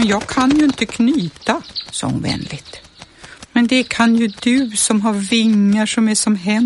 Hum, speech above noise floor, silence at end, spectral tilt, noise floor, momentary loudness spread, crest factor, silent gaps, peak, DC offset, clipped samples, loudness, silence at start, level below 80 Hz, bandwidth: none; 24 dB; 0 s; -4 dB/octave; -40 dBFS; 9 LU; 14 dB; none; -2 dBFS; under 0.1%; under 0.1%; -16 LUFS; 0 s; -48 dBFS; 11.5 kHz